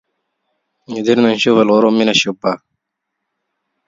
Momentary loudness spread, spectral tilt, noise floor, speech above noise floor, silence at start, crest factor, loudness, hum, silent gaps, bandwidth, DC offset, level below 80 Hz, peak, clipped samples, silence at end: 10 LU; -4.5 dB/octave; -77 dBFS; 64 dB; 0.9 s; 16 dB; -13 LUFS; none; none; 7.8 kHz; under 0.1%; -60 dBFS; 0 dBFS; under 0.1%; 1.3 s